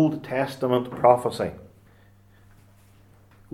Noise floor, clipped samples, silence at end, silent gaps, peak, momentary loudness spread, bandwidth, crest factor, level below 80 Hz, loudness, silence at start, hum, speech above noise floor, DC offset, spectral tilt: -55 dBFS; under 0.1%; 1.85 s; none; -2 dBFS; 12 LU; 15 kHz; 24 dB; -60 dBFS; -23 LUFS; 0 s; none; 32 dB; under 0.1%; -7 dB/octave